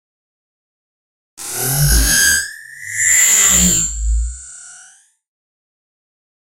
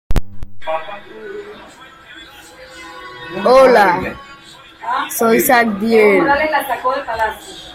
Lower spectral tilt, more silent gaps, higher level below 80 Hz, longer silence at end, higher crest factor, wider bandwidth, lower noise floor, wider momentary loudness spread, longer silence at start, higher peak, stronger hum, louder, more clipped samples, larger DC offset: second, -1.5 dB/octave vs -4.5 dB/octave; neither; first, -26 dBFS vs -32 dBFS; first, 1.75 s vs 0 s; about the same, 18 dB vs 16 dB; about the same, 16 kHz vs 16.5 kHz; first, -47 dBFS vs -40 dBFS; second, 21 LU vs 24 LU; first, 1.4 s vs 0.1 s; about the same, 0 dBFS vs 0 dBFS; neither; about the same, -12 LUFS vs -14 LUFS; neither; neither